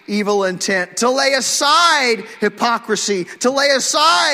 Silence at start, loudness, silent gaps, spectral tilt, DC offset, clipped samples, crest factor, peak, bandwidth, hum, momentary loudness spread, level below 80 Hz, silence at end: 0.1 s; -15 LUFS; none; -1.5 dB/octave; under 0.1%; under 0.1%; 14 dB; -2 dBFS; 16 kHz; none; 7 LU; -66 dBFS; 0 s